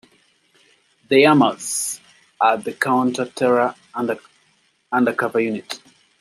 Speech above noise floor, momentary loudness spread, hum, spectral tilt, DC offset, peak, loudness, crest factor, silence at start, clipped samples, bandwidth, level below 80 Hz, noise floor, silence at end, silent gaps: 43 dB; 14 LU; none; -4 dB/octave; under 0.1%; -2 dBFS; -19 LUFS; 18 dB; 1.1 s; under 0.1%; 15 kHz; -70 dBFS; -62 dBFS; 0.45 s; none